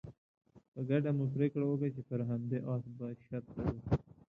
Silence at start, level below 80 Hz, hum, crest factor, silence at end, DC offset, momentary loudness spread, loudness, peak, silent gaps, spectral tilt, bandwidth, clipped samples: 0.05 s; -56 dBFS; none; 18 dB; 0.35 s; under 0.1%; 12 LU; -37 LUFS; -18 dBFS; 0.18-0.41 s, 0.68-0.72 s; -11 dB/octave; 5.2 kHz; under 0.1%